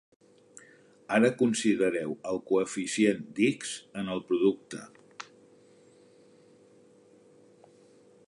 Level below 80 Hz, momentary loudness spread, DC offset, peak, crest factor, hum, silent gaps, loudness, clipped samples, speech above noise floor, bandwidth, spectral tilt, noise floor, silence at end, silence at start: -74 dBFS; 20 LU; under 0.1%; -12 dBFS; 20 dB; none; none; -28 LUFS; under 0.1%; 31 dB; 11 kHz; -4.5 dB/octave; -59 dBFS; 3.05 s; 1.1 s